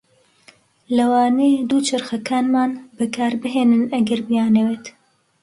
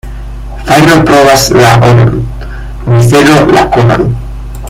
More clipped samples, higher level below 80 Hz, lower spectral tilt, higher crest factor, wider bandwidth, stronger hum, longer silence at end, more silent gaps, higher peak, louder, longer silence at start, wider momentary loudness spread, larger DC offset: second, under 0.1% vs 3%; second, -64 dBFS vs -22 dBFS; about the same, -5 dB/octave vs -5.5 dB/octave; first, 12 dB vs 6 dB; second, 11.5 kHz vs 16.5 kHz; neither; first, 0.55 s vs 0 s; neither; second, -6 dBFS vs 0 dBFS; second, -18 LUFS vs -5 LUFS; first, 0.9 s vs 0.05 s; second, 8 LU vs 18 LU; neither